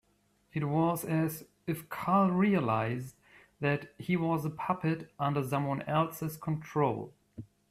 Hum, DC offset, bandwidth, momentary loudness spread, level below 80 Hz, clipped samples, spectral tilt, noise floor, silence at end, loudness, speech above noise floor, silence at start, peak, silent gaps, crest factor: none; under 0.1%; 16 kHz; 13 LU; -66 dBFS; under 0.1%; -7 dB/octave; -71 dBFS; 0.25 s; -32 LUFS; 40 dB; 0.55 s; -14 dBFS; none; 18 dB